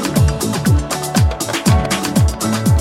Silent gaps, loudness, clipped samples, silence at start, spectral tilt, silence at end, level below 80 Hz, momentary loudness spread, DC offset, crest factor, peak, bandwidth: none; -16 LUFS; under 0.1%; 0 s; -5 dB/octave; 0 s; -24 dBFS; 3 LU; under 0.1%; 14 dB; -2 dBFS; 16.5 kHz